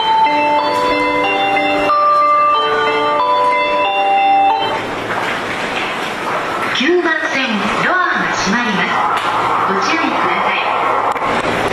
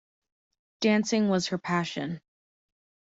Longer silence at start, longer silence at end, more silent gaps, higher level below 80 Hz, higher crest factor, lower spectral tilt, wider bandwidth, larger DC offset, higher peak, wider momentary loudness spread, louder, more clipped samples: second, 0 s vs 0.8 s; second, 0 s vs 0.95 s; neither; first, -48 dBFS vs -70 dBFS; second, 12 dB vs 18 dB; second, -3.5 dB/octave vs -5 dB/octave; first, 14 kHz vs 7.8 kHz; neither; first, -4 dBFS vs -12 dBFS; second, 6 LU vs 11 LU; first, -14 LUFS vs -27 LUFS; neither